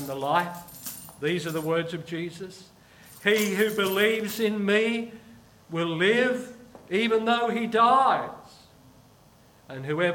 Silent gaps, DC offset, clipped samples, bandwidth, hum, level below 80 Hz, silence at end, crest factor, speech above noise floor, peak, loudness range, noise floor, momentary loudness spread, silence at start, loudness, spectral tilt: none; under 0.1%; under 0.1%; 19 kHz; none; -66 dBFS; 0 s; 20 dB; 31 dB; -6 dBFS; 4 LU; -56 dBFS; 16 LU; 0 s; -25 LUFS; -4.5 dB/octave